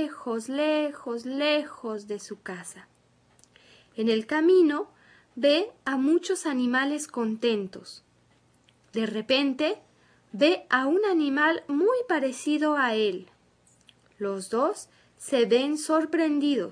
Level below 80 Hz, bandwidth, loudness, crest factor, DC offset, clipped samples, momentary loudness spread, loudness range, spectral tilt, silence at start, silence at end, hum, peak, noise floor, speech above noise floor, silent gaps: -76 dBFS; 11 kHz; -26 LUFS; 18 dB; under 0.1%; under 0.1%; 15 LU; 5 LU; -4 dB/octave; 0 s; 0 s; none; -8 dBFS; -63 dBFS; 38 dB; none